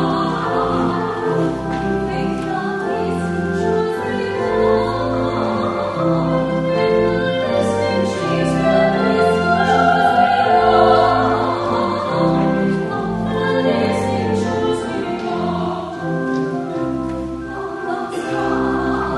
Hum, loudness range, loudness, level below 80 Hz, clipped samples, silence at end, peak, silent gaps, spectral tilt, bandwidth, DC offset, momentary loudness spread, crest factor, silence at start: none; 7 LU; -18 LUFS; -40 dBFS; under 0.1%; 0 s; 0 dBFS; none; -6.5 dB/octave; 11.5 kHz; under 0.1%; 9 LU; 16 dB; 0 s